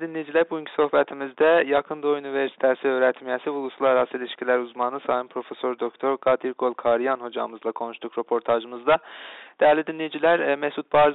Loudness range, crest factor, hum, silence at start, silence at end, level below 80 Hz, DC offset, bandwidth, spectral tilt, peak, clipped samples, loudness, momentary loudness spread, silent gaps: 3 LU; 14 dB; none; 0 s; 0 s; -64 dBFS; under 0.1%; 4.1 kHz; -2.5 dB/octave; -10 dBFS; under 0.1%; -24 LUFS; 10 LU; none